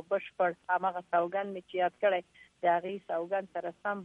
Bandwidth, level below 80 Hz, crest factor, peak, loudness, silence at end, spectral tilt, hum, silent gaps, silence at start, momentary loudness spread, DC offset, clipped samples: 4.5 kHz; -80 dBFS; 16 dB; -16 dBFS; -32 LUFS; 0 s; -6.5 dB/octave; none; none; 0.1 s; 7 LU; under 0.1%; under 0.1%